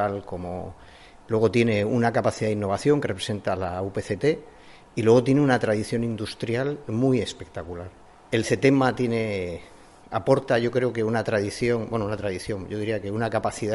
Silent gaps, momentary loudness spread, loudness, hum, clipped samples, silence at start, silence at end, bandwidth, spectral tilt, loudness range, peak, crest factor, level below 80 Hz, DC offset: none; 13 LU; -24 LUFS; none; under 0.1%; 0 s; 0 s; 11.5 kHz; -6.5 dB/octave; 2 LU; -6 dBFS; 18 dB; -54 dBFS; under 0.1%